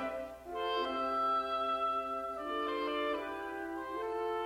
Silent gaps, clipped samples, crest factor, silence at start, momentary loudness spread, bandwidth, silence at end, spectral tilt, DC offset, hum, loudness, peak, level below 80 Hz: none; under 0.1%; 14 dB; 0 s; 8 LU; 16.5 kHz; 0 s; -4 dB/octave; under 0.1%; 60 Hz at -65 dBFS; -36 LUFS; -22 dBFS; -64 dBFS